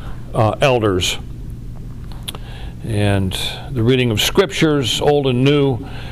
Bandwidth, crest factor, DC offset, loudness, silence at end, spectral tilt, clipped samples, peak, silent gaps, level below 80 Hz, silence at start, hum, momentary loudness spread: 15.5 kHz; 14 dB; 0.5%; -16 LUFS; 0 s; -5 dB/octave; under 0.1%; -4 dBFS; none; -34 dBFS; 0 s; none; 18 LU